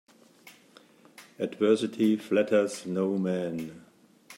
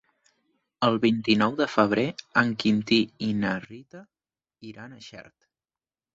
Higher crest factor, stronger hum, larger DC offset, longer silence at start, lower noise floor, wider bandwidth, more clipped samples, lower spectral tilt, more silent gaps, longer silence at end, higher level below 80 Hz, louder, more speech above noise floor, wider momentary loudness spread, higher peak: about the same, 18 dB vs 22 dB; neither; neither; second, 0.45 s vs 0.8 s; second, -57 dBFS vs under -90 dBFS; first, 16 kHz vs 7.8 kHz; neither; about the same, -6 dB/octave vs -6 dB/octave; neither; second, 0 s vs 0.95 s; second, -78 dBFS vs -62 dBFS; second, -28 LUFS vs -24 LUFS; second, 30 dB vs over 65 dB; second, 11 LU vs 21 LU; second, -10 dBFS vs -6 dBFS